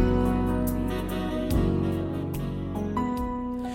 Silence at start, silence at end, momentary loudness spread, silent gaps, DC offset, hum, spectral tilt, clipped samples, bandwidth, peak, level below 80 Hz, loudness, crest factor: 0 s; 0 s; 6 LU; none; under 0.1%; none; -7.5 dB/octave; under 0.1%; 17 kHz; -10 dBFS; -34 dBFS; -28 LUFS; 16 dB